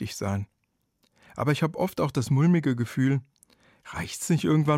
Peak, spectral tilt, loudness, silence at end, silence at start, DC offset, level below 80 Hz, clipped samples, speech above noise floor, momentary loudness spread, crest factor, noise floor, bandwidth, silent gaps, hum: -12 dBFS; -6.5 dB/octave; -26 LUFS; 0 s; 0 s; under 0.1%; -60 dBFS; under 0.1%; 50 dB; 13 LU; 14 dB; -75 dBFS; 16 kHz; none; none